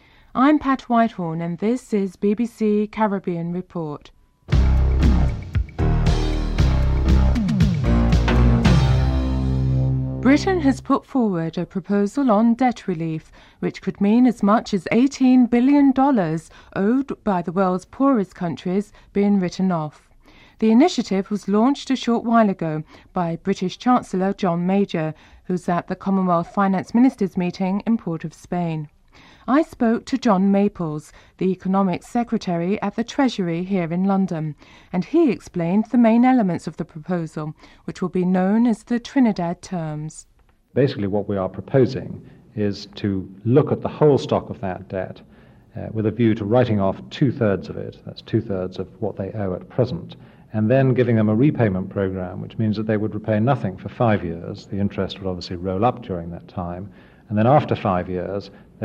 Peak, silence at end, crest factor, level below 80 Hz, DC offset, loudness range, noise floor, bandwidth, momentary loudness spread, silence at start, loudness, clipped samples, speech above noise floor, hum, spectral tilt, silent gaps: -4 dBFS; 0 s; 16 dB; -30 dBFS; under 0.1%; 5 LU; -50 dBFS; 10 kHz; 13 LU; 0.35 s; -21 LUFS; under 0.1%; 29 dB; none; -8 dB/octave; none